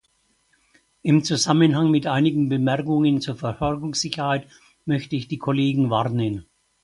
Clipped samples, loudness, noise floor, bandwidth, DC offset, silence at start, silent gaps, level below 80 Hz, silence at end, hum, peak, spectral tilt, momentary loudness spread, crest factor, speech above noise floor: under 0.1%; -22 LUFS; -66 dBFS; 11.5 kHz; under 0.1%; 1.05 s; none; -52 dBFS; 0.4 s; none; -4 dBFS; -5.5 dB/octave; 10 LU; 18 dB; 45 dB